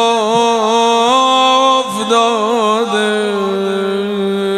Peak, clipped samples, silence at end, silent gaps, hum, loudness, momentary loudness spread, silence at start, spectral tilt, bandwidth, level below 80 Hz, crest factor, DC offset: 0 dBFS; under 0.1%; 0 s; none; none; -13 LUFS; 6 LU; 0 s; -3.5 dB/octave; 14 kHz; -58 dBFS; 12 dB; under 0.1%